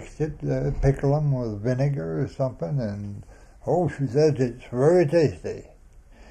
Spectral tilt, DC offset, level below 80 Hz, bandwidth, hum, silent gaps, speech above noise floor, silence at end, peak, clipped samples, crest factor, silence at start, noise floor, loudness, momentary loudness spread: -8.5 dB/octave; under 0.1%; -40 dBFS; 9.2 kHz; none; none; 26 dB; 0 s; -6 dBFS; under 0.1%; 18 dB; 0 s; -49 dBFS; -24 LUFS; 15 LU